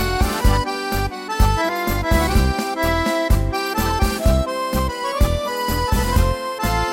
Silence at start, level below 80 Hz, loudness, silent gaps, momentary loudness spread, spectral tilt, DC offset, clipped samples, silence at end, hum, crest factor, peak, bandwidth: 0 s; -22 dBFS; -20 LUFS; none; 4 LU; -5 dB/octave; under 0.1%; under 0.1%; 0 s; none; 16 dB; -2 dBFS; 16.5 kHz